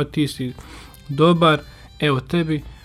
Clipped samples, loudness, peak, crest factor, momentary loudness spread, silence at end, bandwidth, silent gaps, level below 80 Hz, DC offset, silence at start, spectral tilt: under 0.1%; -20 LUFS; -2 dBFS; 18 dB; 21 LU; 0.1 s; 14 kHz; none; -44 dBFS; under 0.1%; 0 s; -6.5 dB/octave